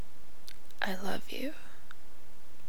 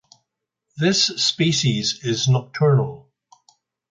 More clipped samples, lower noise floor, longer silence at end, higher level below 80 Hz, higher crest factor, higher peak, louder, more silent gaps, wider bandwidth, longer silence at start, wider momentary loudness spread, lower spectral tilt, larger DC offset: neither; second, -57 dBFS vs -79 dBFS; second, 0 s vs 0.9 s; about the same, -60 dBFS vs -58 dBFS; first, 24 dB vs 18 dB; second, -14 dBFS vs -4 dBFS; second, -38 LUFS vs -19 LUFS; neither; first, over 20 kHz vs 9.2 kHz; second, 0 s vs 0.75 s; first, 22 LU vs 5 LU; about the same, -4.5 dB/octave vs -4.5 dB/octave; first, 4% vs under 0.1%